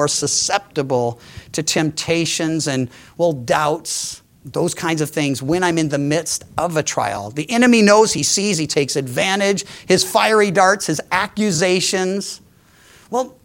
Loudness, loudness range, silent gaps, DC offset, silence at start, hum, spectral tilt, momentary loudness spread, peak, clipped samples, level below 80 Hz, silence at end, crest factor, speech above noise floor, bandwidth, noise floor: -18 LUFS; 5 LU; none; under 0.1%; 0 s; none; -3.5 dB/octave; 10 LU; 0 dBFS; under 0.1%; -54 dBFS; 0.15 s; 18 dB; 32 dB; 17 kHz; -49 dBFS